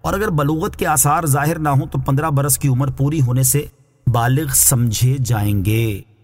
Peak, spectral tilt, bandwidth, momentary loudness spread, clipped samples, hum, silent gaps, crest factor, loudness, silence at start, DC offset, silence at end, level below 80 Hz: -2 dBFS; -5 dB/octave; 16.5 kHz; 7 LU; under 0.1%; none; none; 16 dB; -16 LUFS; 0.05 s; under 0.1%; 0.2 s; -36 dBFS